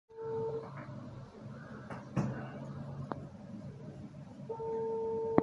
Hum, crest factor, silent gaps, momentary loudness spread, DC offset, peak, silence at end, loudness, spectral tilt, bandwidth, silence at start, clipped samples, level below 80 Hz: none; 32 dB; none; 13 LU; under 0.1%; -8 dBFS; 0 s; -41 LUFS; -9 dB/octave; 7.8 kHz; 0.1 s; under 0.1%; -62 dBFS